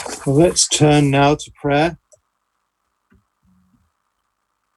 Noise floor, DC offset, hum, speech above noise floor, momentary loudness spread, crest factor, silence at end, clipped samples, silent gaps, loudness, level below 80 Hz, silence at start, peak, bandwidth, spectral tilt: -72 dBFS; under 0.1%; none; 57 dB; 7 LU; 18 dB; 2.8 s; under 0.1%; none; -15 LUFS; -44 dBFS; 0 s; -2 dBFS; 12.5 kHz; -4.5 dB/octave